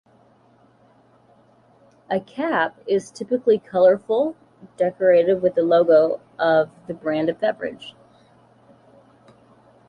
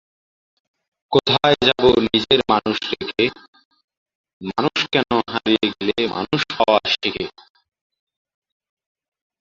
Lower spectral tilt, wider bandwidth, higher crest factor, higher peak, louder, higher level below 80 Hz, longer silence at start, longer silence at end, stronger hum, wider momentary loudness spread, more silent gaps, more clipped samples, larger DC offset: first, -6.5 dB/octave vs -5 dB/octave; first, 10.5 kHz vs 7.6 kHz; about the same, 16 dB vs 20 dB; second, -6 dBFS vs -2 dBFS; about the same, -20 LUFS vs -18 LUFS; second, -66 dBFS vs -50 dBFS; first, 2.1 s vs 1.1 s; second, 2 s vs 2.15 s; neither; about the same, 11 LU vs 9 LU; second, none vs 3.48-3.53 s, 3.65-3.71 s, 3.84-3.88 s, 3.97-4.06 s, 4.15-4.24 s, 4.33-4.40 s; neither; neither